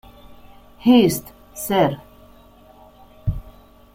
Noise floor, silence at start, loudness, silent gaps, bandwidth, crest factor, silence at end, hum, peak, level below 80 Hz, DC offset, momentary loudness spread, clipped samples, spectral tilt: -48 dBFS; 0.3 s; -19 LUFS; none; 16.5 kHz; 20 dB; 0.45 s; none; -4 dBFS; -40 dBFS; under 0.1%; 20 LU; under 0.1%; -5.5 dB/octave